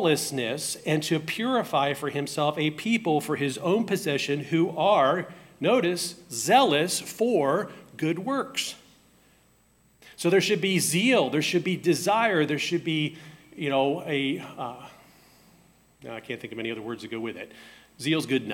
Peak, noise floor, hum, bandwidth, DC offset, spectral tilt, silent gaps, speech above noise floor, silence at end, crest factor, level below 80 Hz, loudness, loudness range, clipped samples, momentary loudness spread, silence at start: -6 dBFS; -62 dBFS; none; 16.5 kHz; under 0.1%; -4 dB/octave; none; 37 dB; 0 s; 20 dB; -70 dBFS; -26 LUFS; 9 LU; under 0.1%; 14 LU; 0 s